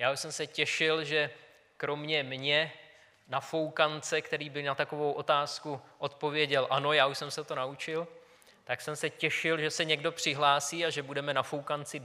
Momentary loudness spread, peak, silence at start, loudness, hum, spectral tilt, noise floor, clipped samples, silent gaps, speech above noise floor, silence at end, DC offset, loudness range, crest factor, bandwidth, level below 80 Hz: 10 LU; -10 dBFS; 0 s; -31 LUFS; none; -3 dB/octave; -59 dBFS; under 0.1%; none; 27 dB; 0 s; under 0.1%; 2 LU; 22 dB; 15.5 kHz; -82 dBFS